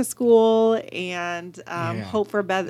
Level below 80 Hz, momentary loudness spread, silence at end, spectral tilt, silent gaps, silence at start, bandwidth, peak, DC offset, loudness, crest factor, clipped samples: -68 dBFS; 13 LU; 0 s; -5 dB/octave; none; 0 s; 14.5 kHz; -6 dBFS; under 0.1%; -21 LUFS; 16 dB; under 0.1%